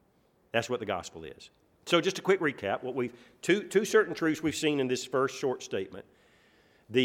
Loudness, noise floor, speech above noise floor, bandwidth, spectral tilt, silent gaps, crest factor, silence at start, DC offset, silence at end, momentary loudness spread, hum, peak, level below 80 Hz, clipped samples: -30 LUFS; -67 dBFS; 38 dB; 16 kHz; -4 dB/octave; none; 20 dB; 0.55 s; under 0.1%; 0 s; 13 LU; none; -10 dBFS; -70 dBFS; under 0.1%